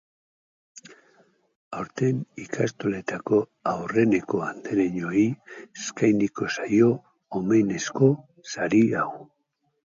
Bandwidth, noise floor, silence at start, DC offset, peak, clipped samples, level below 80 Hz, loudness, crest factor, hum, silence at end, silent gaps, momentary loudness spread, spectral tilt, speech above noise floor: 7.6 kHz; -74 dBFS; 0.75 s; under 0.1%; -6 dBFS; under 0.1%; -64 dBFS; -25 LUFS; 20 dB; none; 0.75 s; 1.56-1.71 s; 14 LU; -6.5 dB/octave; 50 dB